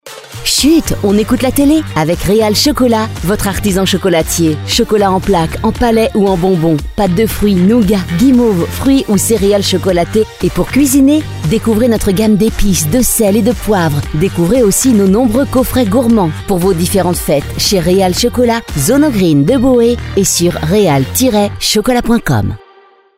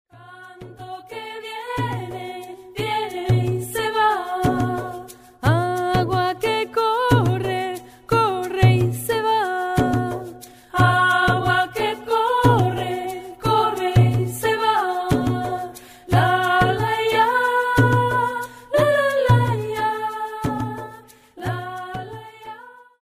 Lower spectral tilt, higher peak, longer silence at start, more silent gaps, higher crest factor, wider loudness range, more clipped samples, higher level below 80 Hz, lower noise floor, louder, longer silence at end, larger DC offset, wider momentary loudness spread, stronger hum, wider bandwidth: about the same, -5 dB/octave vs -6 dB/octave; about the same, 0 dBFS vs -2 dBFS; second, 0.05 s vs 0.2 s; neither; second, 10 dB vs 18 dB; second, 1 LU vs 5 LU; neither; first, -26 dBFS vs -44 dBFS; about the same, -44 dBFS vs -44 dBFS; first, -11 LUFS vs -20 LUFS; first, 0.6 s vs 0.3 s; neither; second, 5 LU vs 16 LU; neither; about the same, 16.5 kHz vs 16 kHz